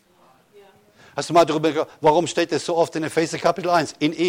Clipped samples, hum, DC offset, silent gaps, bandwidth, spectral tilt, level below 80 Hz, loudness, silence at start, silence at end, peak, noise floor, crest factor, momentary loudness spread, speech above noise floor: under 0.1%; none; under 0.1%; none; 16 kHz; -4.5 dB/octave; -60 dBFS; -21 LUFS; 1.15 s; 0 s; -6 dBFS; -56 dBFS; 16 dB; 5 LU; 36 dB